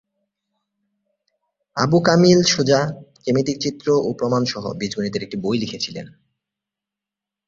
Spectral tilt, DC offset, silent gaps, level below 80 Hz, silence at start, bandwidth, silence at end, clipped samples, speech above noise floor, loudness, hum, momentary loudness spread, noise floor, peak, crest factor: -5 dB/octave; under 0.1%; none; -56 dBFS; 1.75 s; 7.6 kHz; 1.4 s; under 0.1%; 68 dB; -19 LUFS; none; 13 LU; -87 dBFS; -2 dBFS; 20 dB